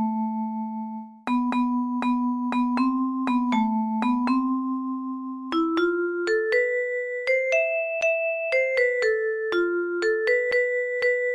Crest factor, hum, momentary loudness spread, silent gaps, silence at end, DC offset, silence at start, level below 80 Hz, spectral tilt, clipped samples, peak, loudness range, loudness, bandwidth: 14 dB; none; 7 LU; none; 0 s; under 0.1%; 0 s; -64 dBFS; -5.5 dB/octave; under 0.1%; -10 dBFS; 2 LU; -24 LUFS; 10.5 kHz